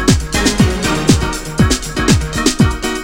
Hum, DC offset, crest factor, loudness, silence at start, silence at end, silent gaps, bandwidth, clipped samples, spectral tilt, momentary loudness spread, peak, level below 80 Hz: none; under 0.1%; 14 dB; -14 LUFS; 0 s; 0 s; none; 17 kHz; under 0.1%; -4.5 dB/octave; 3 LU; 0 dBFS; -22 dBFS